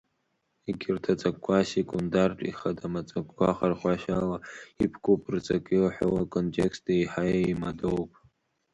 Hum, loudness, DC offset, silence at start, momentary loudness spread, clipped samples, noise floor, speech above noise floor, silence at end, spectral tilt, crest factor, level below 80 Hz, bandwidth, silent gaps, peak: none; -28 LUFS; under 0.1%; 0.65 s; 8 LU; under 0.1%; -76 dBFS; 48 dB; 0.65 s; -7 dB/octave; 18 dB; -54 dBFS; 10.5 kHz; none; -10 dBFS